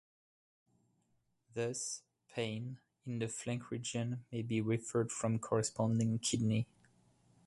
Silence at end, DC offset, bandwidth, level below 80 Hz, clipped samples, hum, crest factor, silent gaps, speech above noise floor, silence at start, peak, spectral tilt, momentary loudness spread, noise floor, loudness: 0.8 s; under 0.1%; 11.5 kHz; -70 dBFS; under 0.1%; none; 20 dB; none; 42 dB; 1.55 s; -18 dBFS; -5 dB/octave; 12 LU; -78 dBFS; -38 LUFS